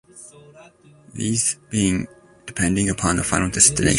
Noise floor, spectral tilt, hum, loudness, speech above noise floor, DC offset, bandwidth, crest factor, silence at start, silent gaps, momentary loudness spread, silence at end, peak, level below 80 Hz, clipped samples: -49 dBFS; -3.5 dB/octave; none; -19 LUFS; 29 dB; under 0.1%; 11.5 kHz; 22 dB; 0.15 s; none; 20 LU; 0 s; 0 dBFS; -40 dBFS; under 0.1%